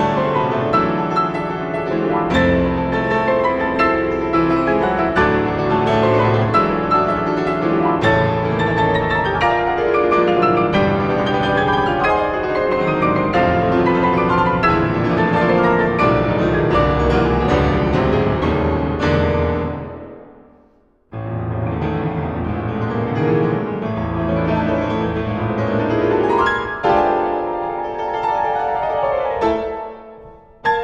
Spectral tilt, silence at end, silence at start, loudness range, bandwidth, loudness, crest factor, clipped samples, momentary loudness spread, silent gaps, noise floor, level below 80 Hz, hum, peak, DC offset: -8 dB/octave; 0 s; 0 s; 5 LU; 8.4 kHz; -17 LUFS; 16 dB; under 0.1%; 7 LU; none; -54 dBFS; -34 dBFS; none; -2 dBFS; under 0.1%